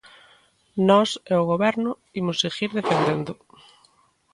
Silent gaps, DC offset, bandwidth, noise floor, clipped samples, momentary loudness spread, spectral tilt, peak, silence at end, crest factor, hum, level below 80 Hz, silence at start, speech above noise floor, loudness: none; under 0.1%; 11 kHz; -61 dBFS; under 0.1%; 11 LU; -5.5 dB/octave; -6 dBFS; 1 s; 18 dB; none; -64 dBFS; 0.75 s; 39 dB; -22 LUFS